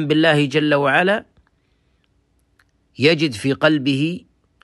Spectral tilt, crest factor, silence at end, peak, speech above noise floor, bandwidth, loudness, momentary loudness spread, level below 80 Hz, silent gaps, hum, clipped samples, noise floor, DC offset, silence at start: -6 dB/octave; 18 dB; 0.45 s; -2 dBFS; 46 dB; 12 kHz; -17 LUFS; 7 LU; -62 dBFS; none; none; under 0.1%; -63 dBFS; under 0.1%; 0 s